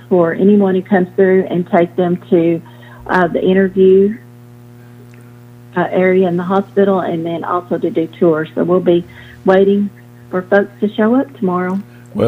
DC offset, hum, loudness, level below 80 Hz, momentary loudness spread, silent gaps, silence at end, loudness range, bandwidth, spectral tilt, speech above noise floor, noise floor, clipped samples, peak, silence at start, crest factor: under 0.1%; 60 Hz at -35 dBFS; -14 LUFS; -52 dBFS; 10 LU; none; 0 s; 3 LU; 5 kHz; -9 dB/octave; 25 dB; -38 dBFS; under 0.1%; 0 dBFS; 0.1 s; 14 dB